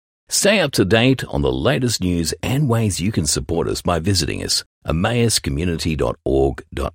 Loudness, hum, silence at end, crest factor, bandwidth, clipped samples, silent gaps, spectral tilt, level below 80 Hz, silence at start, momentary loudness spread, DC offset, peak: -19 LUFS; none; 0.05 s; 16 dB; 16.5 kHz; under 0.1%; 4.66-4.81 s; -4.5 dB/octave; -34 dBFS; 0.3 s; 6 LU; under 0.1%; -2 dBFS